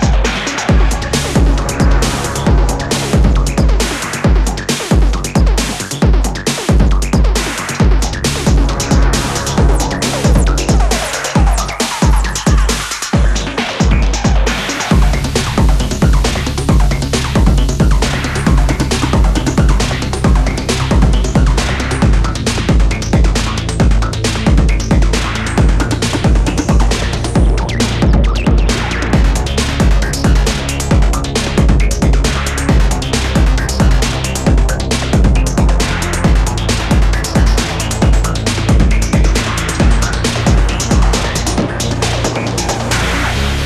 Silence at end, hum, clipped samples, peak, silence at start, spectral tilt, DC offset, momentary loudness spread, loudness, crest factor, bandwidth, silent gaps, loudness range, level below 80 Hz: 0 s; none; under 0.1%; 0 dBFS; 0 s; -5 dB/octave; under 0.1%; 3 LU; -14 LUFS; 12 dB; 13.5 kHz; none; 1 LU; -14 dBFS